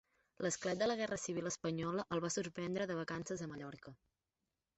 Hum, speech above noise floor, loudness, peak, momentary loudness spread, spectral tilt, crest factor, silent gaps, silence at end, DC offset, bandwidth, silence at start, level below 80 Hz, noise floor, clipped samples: none; over 50 dB; -40 LUFS; -24 dBFS; 11 LU; -4.5 dB/octave; 18 dB; none; 0.85 s; under 0.1%; 8.2 kHz; 0.4 s; -72 dBFS; under -90 dBFS; under 0.1%